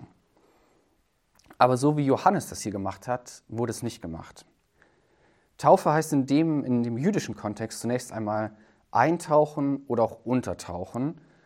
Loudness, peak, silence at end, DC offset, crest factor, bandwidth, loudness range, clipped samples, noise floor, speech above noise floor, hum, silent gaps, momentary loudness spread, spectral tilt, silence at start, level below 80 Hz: -26 LUFS; -4 dBFS; 0.25 s; under 0.1%; 24 dB; 16 kHz; 4 LU; under 0.1%; -70 dBFS; 44 dB; none; none; 13 LU; -6.5 dB/octave; 0 s; -62 dBFS